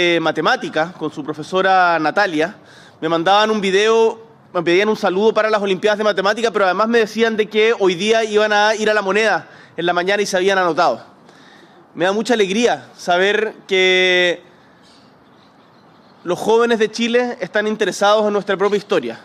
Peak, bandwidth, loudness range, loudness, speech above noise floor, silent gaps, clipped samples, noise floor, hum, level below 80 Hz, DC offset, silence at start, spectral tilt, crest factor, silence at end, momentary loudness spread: -4 dBFS; 13 kHz; 3 LU; -16 LUFS; 32 dB; none; under 0.1%; -48 dBFS; none; -66 dBFS; under 0.1%; 0 s; -4 dB/octave; 14 dB; 0.05 s; 8 LU